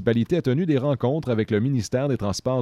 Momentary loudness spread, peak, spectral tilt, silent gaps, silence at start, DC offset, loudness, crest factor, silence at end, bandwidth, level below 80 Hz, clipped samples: 3 LU; -8 dBFS; -7 dB/octave; none; 0 s; under 0.1%; -23 LUFS; 14 dB; 0 s; 13 kHz; -52 dBFS; under 0.1%